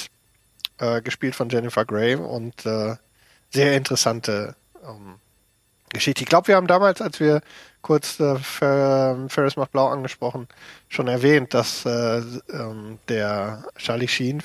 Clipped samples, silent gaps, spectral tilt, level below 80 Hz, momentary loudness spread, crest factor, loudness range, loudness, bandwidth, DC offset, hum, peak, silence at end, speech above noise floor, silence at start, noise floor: under 0.1%; none; -5 dB/octave; -62 dBFS; 15 LU; 20 dB; 5 LU; -22 LUFS; 15.5 kHz; under 0.1%; none; -2 dBFS; 0 s; 41 dB; 0 s; -63 dBFS